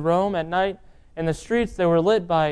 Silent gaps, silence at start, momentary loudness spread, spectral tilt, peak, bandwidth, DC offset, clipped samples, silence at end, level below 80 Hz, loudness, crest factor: none; 0 s; 9 LU; -6.5 dB/octave; -8 dBFS; 11 kHz; under 0.1%; under 0.1%; 0 s; -46 dBFS; -22 LUFS; 14 dB